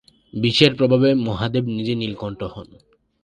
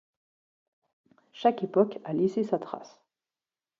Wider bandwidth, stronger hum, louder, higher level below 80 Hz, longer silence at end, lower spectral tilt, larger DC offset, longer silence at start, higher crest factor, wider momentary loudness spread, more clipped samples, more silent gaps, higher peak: first, 10.5 kHz vs 7.4 kHz; neither; first, -19 LUFS vs -28 LUFS; first, -50 dBFS vs -80 dBFS; second, 0.6 s vs 0.9 s; second, -6.5 dB/octave vs -8 dB/octave; neither; second, 0.35 s vs 1.35 s; about the same, 20 dB vs 20 dB; first, 17 LU vs 10 LU; neither; neither; first, 0 dBFS vs -10 dBFS